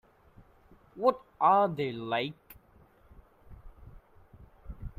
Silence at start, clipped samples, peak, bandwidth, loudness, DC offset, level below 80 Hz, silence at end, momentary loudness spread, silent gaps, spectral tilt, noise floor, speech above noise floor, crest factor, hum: 0.95 s; under 0.1%; -10 dBFS; 15.5 kHz; -29 LUFS; under 0.1%; -54 dBFS; 0.1 s; 23 LU; none; -7.5 dB/octave; -61 dBFS; 33 dB; 22 dB; none